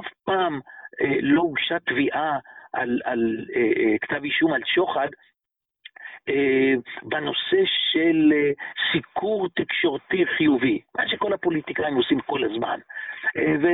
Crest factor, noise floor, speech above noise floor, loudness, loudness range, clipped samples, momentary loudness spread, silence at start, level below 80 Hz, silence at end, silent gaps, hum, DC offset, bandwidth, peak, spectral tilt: 14 dB; -87 dBFS; 64 dB; -23 LUFS; 3 LU; under 0.1%; 9 LU; 0 s; -62 dBFS; 0 s; none; none; under 0.1%; 4.1 kHz; -10 dBFS; -9.5 dB/octave